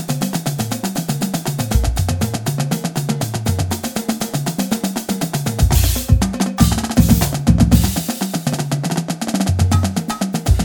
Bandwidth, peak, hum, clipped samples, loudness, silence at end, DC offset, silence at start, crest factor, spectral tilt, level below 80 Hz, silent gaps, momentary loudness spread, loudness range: over 20 kHz; 0 dBFS; none; under 0.1%; -18 LUFS; 0 s; under 0.1%; 0 s; 16 dB; -5 dB/octave; -24 dBFS; none; 7 LU; 5 LU